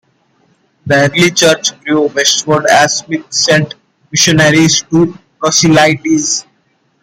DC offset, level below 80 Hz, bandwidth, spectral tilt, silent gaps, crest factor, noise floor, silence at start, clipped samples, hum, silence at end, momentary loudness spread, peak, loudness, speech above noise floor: under 0.1%; -48 dBFS; 16.5 kHz; -3.5 dB/octave; none; 12 dB; -57 dBFS; 0.85 s; under 0.1%; none; 0.6 s; 9 LU; 0 dBFS; -10 LUFS; 47 dB